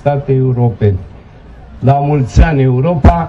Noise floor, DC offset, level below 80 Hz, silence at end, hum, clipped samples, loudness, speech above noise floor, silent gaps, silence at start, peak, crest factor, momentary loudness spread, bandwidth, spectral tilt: -35 dBFS; under 0.1%; -18 dBFS; 0 s; none; 0.6%; -12 LUFS; 25 dB; none; 0.05 s; 0 dBFS; 12 dB; 5 LU; 7.6 kHz; -9 dB/octave